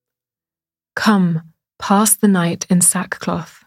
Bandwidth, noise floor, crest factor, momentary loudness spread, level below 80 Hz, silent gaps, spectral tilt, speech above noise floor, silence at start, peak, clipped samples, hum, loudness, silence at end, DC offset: 16 kHz; under -90 dBFS; 18 dB; 12 LU; -60 dBFS; none; -4 dB/octave; over 74 dB; 0.95 s; 0 dBFS; under 0.1%; none; -15 LUFS; 0.2 s; under 0.1%